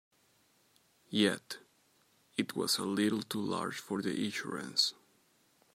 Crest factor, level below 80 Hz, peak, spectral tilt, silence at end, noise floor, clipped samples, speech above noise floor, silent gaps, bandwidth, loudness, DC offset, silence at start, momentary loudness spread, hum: 22 dB; -82 dBFS; -14 dBFS; -3.5 dB/octave; 0.8 s; -70 dBFS; under 0.1%; 36 dB; none; 16 kHz; -34 LUFS; under 0.1%; 1.1 s; 9 LU; none